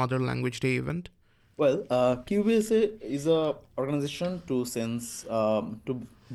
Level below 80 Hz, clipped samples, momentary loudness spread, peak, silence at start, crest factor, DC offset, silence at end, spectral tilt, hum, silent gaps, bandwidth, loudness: -58 dBFS; under 0.1%; 10 LU; -12 dBFS; 0 s; 16 dB; under 0.1%; 0 s; -6 dB/octave; none; none; 12.5 kHz; -28 LUFS